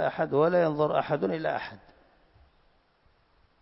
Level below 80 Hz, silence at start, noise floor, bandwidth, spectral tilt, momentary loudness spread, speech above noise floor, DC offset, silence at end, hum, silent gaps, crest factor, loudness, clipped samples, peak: -64 dBFS; 0 s; -66 dBFS; 5.8 kHz; -10.5 dB/octave; 9 LU; 39 dB; under 0.1%; 1.85 s; none; none; 18 dB; -27 LUFS; under 0.1%; -12 dBFS